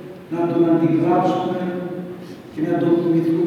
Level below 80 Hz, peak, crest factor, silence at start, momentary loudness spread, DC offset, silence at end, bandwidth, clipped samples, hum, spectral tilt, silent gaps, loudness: -64 dBFS; -4 dBFS; 14 dB; 0 s; 14 LU; under 0.1%; 0 s; 6.8 kHz; under 0.1%; none; -9 dB/octave; none; -19 LUFS